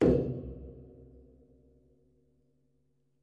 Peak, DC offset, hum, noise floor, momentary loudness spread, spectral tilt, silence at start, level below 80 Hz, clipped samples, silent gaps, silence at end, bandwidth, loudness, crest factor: -14 dBFS; under 0.1%; none; -75 dBFS; 27 LU; -9.5 dB/octave; 0 s; -50 dBFS; under 0.1%; none; 2.2 s; 7.8 kHz; -32 LUFS; 22 dB